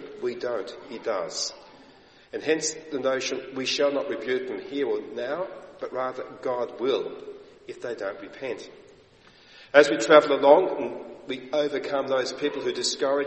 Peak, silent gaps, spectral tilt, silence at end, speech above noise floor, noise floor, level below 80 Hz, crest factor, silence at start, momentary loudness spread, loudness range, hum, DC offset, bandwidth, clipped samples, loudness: -2 dBFS; none; -2.5 dB/octave; 0 s; 29 dB; -55 dBFS; -68 dBFS; 24 dB; 0 s; 18 LU; 10 LU; none; under 0.1%; 8.4 kHz; under 0.1%; -25 LUFS